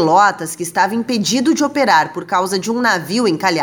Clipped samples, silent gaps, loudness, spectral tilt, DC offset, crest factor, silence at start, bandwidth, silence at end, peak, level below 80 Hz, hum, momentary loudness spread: under 0.1%; none; -16 LUFS; -3.5 dB/octave; under 0.1%; 14 dB; 0 s; over 20 kHz; 0 s; 0 dBFS; -64 dBFS; none; 6 LU